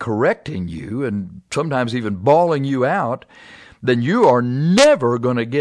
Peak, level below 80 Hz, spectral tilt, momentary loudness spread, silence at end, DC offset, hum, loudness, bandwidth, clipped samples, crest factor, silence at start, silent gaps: -2 dBFS; -52 dBFS; -6 dB/octave; 13 LU; 0 s; under 0.1%; none; -18 LUFS; 11 kHz; under 0.1%; 16 dB; 0 s; none